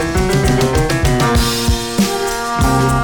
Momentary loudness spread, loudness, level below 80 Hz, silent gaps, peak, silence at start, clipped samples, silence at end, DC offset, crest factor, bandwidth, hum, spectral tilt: 3 LU; -15 LUFS; -22 dBFS; none; -6 dBFS; 0 s; under 0.1%; 0 s; 0.8%; 8 dB; over 20 kHz; none; -5 dB/octave